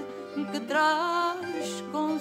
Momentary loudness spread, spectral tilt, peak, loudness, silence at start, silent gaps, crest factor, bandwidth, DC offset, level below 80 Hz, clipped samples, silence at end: 9 LU; -3.5 dB/octave; -12 dBFS; -28 LUFS; 0 s; none; 16 dB; 16 kHz; under 0.1%; -80 dBFS; under 0.1%; 0 s